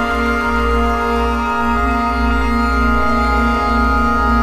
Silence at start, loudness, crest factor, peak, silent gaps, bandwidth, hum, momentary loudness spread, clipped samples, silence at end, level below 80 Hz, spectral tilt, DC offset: 0 s; -15 LUFS; 12 dB; -2 dBFS; none; 14 kHz; none; 2 LU; under 0.1%; 0 s; -20 dBFS; -6.5 dB/octave; under 0.1%